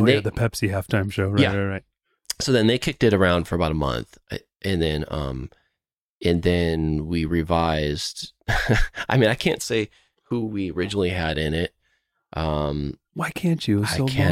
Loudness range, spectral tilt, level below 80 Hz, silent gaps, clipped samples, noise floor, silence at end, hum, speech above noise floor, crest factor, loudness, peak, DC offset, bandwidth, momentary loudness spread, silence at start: 4 LU; -5.5 dB/octave; -36 dBFS; 6.01-6.21 s; under 0.1%; -84 dBFS; 0 s; none; 62 dB; 18 dB; -23 LUFS; -4 dBFS; under 0.1%; 16 kHz; 11 LU; 0 s